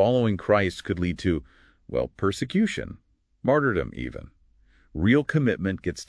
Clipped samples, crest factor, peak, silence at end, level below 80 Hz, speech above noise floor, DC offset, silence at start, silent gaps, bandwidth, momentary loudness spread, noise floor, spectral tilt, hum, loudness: under 0.1%; 18 dB; -8 dBFS; 0.05 s; -46 dBFS; 35 dB; under 0.1%; 0 s; none; 11 kHz; 13 LU; -59 dBFS; -6.5 dB/octave; none; -25 LUFS